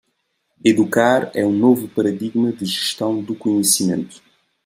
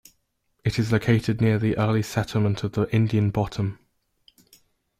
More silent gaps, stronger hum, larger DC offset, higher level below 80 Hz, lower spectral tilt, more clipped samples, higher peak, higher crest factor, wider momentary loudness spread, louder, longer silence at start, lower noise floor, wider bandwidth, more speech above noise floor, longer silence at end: neither; neither; neither; second, -64 dBFS vs -52 dBFS; second, -4 dB/octave vs -7 dB/octave; neither; first, 0 dBFS vs -8 dBFS; about the same, 18 dB vs 16 dB; about the same, 7 LU vs 6 LU; first, -18 LUFS vs -24 LUFS; about the same, 0.65 s vs 0.65 s; about the same, -70 dBFS vs -72 dBFS; first, 16 kHz vs 14.5 kHz; about the same, 52 dB vs 49 dB; second, 0.5 s vs 1.25 s